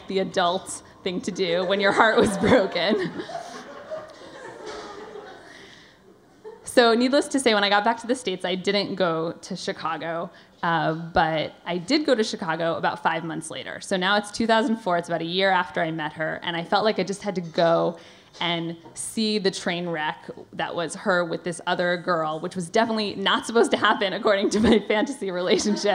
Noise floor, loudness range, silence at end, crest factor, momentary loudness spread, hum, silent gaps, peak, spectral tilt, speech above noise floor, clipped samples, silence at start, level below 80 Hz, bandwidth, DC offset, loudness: -53 dBFS; 5 LU; 0 s; 24 dB; 17 LU; none; none; 0 dBFS; -4 dB/octave; 30 dB; under 0.1%; 0 s; -56 dBFS; 15.5 kHz; under 0.1%; -23 LUFS